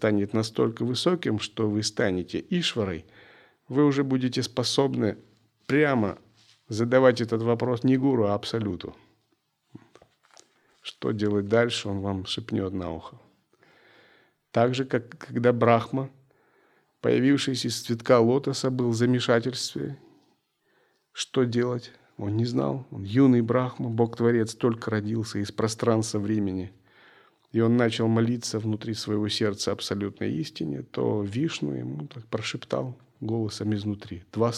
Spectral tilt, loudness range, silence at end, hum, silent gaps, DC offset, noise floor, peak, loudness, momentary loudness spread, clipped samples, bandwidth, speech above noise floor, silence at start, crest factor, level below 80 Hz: -6 dB/octave; 6 LU; 0 s; none; none; under 0.1%; -72 dBFS; -4 dBFS; -26 LUFS; 12 LU; under 0.1%; 13.5 kHz; 47 dB; 0 s; 22 dB; -68 dBFS